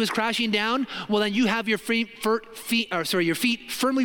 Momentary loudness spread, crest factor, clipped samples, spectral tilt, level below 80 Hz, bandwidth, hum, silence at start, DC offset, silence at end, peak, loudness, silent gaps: 4 LU; 16 dB; under 0.1%; -3.5 dB/octave; -64 dBFS; 17 kHz; none; 0 s; under 0.1%; 0 s; -8 dBFS; -24 LUFS; none